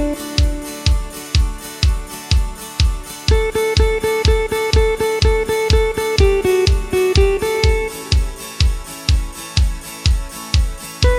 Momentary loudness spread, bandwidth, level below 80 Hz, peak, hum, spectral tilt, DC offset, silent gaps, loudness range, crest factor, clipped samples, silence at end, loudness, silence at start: 6 LU; 16 kHz; -20 dBFS; 0 dBFS; none; -5 dB/octave; under 0.1%; none; 4 LU; 16 dB; under 0.1%; 0 s; -18 LUFS; 0 s